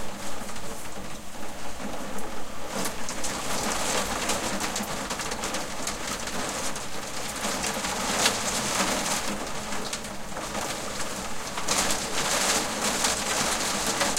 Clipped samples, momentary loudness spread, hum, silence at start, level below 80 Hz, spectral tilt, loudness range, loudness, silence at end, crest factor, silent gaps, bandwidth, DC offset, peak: under 0.1%; 12 LU; none; 0 s; -48 dBFS; -1.5 dB/octave; 5 LU; -28 LUFS; 0 s; 22 dB; none; 16.5 kHz; under 0.1%; -6 dBFS